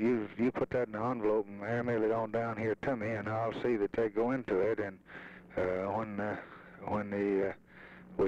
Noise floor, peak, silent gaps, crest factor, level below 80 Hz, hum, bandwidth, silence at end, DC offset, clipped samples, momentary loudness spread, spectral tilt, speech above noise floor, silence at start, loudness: -53 dBFS; -22 dBFS; none; 12 dB; -64 dBFS; none; 7.8 kHz; 0 s; under 0.1%; under 0.1%; 12 LU; -8.5 dB/octave; 20 dB; 0 s; -34 LUFS